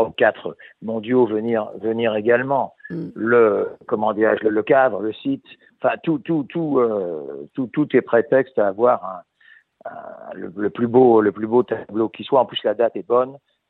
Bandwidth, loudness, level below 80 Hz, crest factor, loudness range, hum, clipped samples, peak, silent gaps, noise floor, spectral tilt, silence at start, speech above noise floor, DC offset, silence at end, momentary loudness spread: 4.1 kHz; -20 LUFS; -66 dBFS; 18 dB; 3 LU; none; under 0.1%; -2 dBFS; none; -53 dBFS; -9.5 dB/octave; 0 s; 33 dB; under 0.1%; 0.35 s; 16 LU